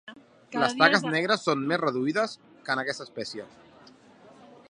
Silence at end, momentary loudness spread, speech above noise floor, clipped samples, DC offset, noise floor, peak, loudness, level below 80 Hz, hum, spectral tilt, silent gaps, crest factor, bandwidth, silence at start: 0.25 s; 15 LU; 27 dB; under 0.1%; under 0.1%; -54 dBFS; -4 dBFS; -26 LUFS; -76 dBFS; none; -4 dB/octave; none; 24 dB; 11 kHz; 0.05 s